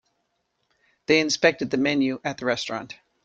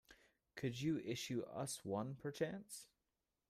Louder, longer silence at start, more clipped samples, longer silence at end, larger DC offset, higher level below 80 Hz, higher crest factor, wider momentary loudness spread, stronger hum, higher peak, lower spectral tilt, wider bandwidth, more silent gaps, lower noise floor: first, -23 LUFS vs -45 LUFS; first, 1.1 s vs 0.1 s; neither; second, 0.3 s vs 0.65 s; neither; first, -64 dBFS vs -78 dBFS; about the same, 22 dB vs 20 dB; about the same, 13 LU vs 13 LU; neither; first, -4 dBFS vs -26 dBFS; second, -3.5 dB/octave vs -5 dB/octave; second, 8.8 kHz vs 15.5 kHz; neither; second, -74 dBFS vs under -90 dBFS